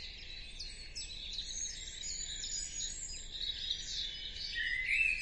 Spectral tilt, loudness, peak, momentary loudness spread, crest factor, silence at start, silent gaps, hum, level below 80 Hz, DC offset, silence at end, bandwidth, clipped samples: 1 dB/octave; -38 LUFS; -22 dBFS; 12 LU; 18 dB; 0 s; none; none; -52 dBFS; under 0.1%; 0 s; 11.5 kHz; under 0.1%